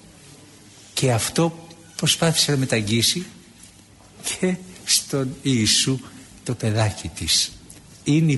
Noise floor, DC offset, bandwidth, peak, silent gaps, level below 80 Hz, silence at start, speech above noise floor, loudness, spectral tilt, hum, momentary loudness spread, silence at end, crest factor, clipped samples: -48 dBFS; under 0.1%; 12 kHz; -6 dBFS; none; -50 dBFS; 0.95 s; 28 dB; -21 LUFS; -3.5 dB/octave; none; 13 LU; 0 s; 18 dB; under 0.1%